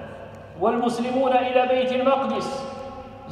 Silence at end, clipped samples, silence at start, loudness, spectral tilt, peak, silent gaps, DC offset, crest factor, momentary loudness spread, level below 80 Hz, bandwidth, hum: 0 s; under 0.1%; 0 s; -22 LUFS; -5 dB/octave; -8 dBFS; none; under 0.1%; 16 dB; 19 LU; -56 dBFS; 11.5 kHz; none